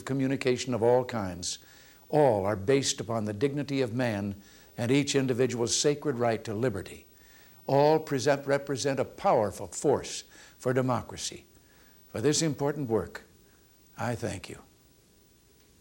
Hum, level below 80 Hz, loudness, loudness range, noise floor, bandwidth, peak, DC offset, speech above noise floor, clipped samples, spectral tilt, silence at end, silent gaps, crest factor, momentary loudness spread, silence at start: none; -62 dBFS; -28 LUFS; 4 LU; -61 dBFS; 17 kHz; -10 dBFS; under 0.1%; 33 dB; under 0.1%; -4.5 dB/octave; 1.2 s; none; 20 dB; 15 LU; 0 s